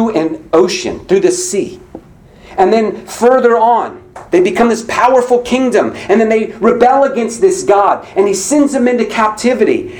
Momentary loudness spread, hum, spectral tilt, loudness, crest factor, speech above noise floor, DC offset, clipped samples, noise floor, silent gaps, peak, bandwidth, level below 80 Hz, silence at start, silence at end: 6 LU; none; -4 dB/octave; -12 LUFS; 12 dB; 28 dB; under 0.1%; 0.1%; -39 dBFS; none; 0 dBFS; 19.5 kHz; -46 dBFS; 0 s; 0 s